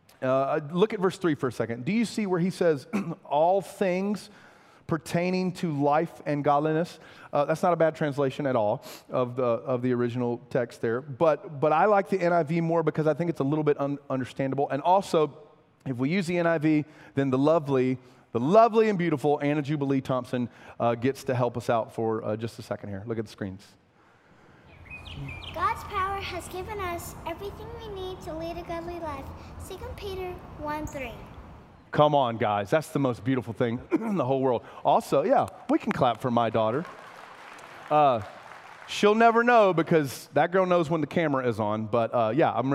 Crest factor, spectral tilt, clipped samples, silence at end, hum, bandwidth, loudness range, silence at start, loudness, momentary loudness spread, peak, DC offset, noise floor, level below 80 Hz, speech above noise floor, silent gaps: 20 dB; -6.5 dB/octave; under 0.1%; 0 s; none; 16 kHz; 11 LU; 0.2 s; -26 LUFS; 14 LU; -6 dBFS; under 0.1%; -60 dBFS; -56 dBFS; 34 dB; none